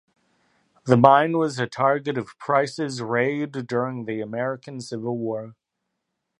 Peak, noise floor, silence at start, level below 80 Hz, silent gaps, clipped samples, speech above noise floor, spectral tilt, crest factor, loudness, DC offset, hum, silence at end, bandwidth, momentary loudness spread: 0 dBFS; -80 dBFS; 0.85 s; -68 dBFS; none; under 0.1%; 57 dB; -6.5 dB/octave; 24 dB; -23 LUFS; under 0.1%; none; 0.9 s; 11 kHz; 15 LU